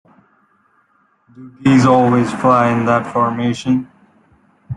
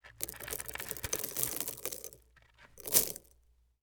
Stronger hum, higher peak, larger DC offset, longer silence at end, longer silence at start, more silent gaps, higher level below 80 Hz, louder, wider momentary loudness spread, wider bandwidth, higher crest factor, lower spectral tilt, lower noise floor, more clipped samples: neither; about the same, -2 dBFS vs -4 dBFS; neither; second, 0 s vs 0.6 s; first, 1.4 s vs 0.05 s; neither; first, -52 dBFS vs -60 dBFS; first, -14 LUFS vs -34 LUFS; second, 8 LU vs 17 LU; second, 10.5 kHz vs over 20 kHz; second, 16 dB vs 34 dB; first, -7 dB/octave vs -1 dB/octave; second, -58 dBFS vs -68 dBFS; neither